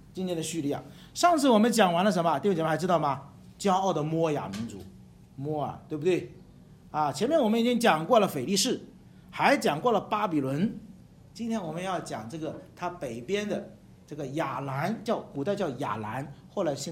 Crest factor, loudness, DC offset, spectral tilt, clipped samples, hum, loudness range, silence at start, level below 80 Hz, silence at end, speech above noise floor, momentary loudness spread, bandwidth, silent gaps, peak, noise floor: 20 dB; -28 LUFS; under 0.1%; -5 dB/octave; under 0.1%; none; 8 LU; 0.15 s; -62 dBFS; 0 s; 25 dB; 14 LU; 16.5 kHz; none; -8 dBFS; -52 dBFS